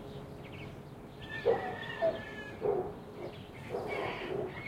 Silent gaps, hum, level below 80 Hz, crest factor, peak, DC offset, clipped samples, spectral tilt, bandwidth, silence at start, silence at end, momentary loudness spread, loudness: none; none; -60 dBFS; 20 dB; -18 dBFS; under 0.1%; under 0.1%; -6.5 dB/octave; 16.5 kHz; 0 s; 0 s; 14 LU; -37 LUFS